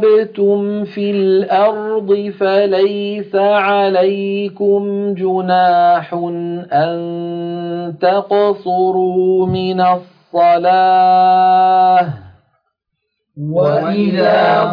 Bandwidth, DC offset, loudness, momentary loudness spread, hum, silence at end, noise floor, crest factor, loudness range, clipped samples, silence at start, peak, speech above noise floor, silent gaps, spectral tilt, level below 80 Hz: 5.2 kHz; under 0.1%; -14 LUFS; 11 LU; none; 0 s; -73 dBFS; 12 dB; 4 LU; under 0.1%; 0 s; -2 dBFS; 60 dB; none; -9 dB/octave; -58 dBFS